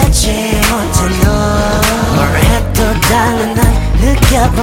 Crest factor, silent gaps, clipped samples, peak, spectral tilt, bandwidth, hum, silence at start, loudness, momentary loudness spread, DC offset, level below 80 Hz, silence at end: 10 dB; none; under 0.1%; 0 dBFS; -4.5 dB/octave; 17.5 kHz; none; 0 s; -11 LUFS; 3 LU; under 0.1%; -16 dBFS; 0 s